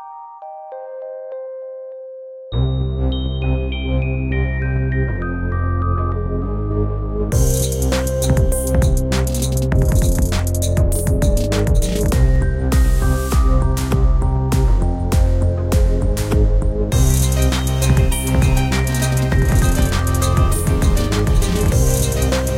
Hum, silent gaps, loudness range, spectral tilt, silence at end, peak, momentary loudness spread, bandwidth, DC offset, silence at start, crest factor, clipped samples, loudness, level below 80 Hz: none; none; 4 LU; -5.5 dB/octave; 0 s; -2 dBFS; 9 LU; 16.5 kHz; under 0.1%; 0 s; 14 dB; under 0.1%; -18 LUFS; -18 dBFS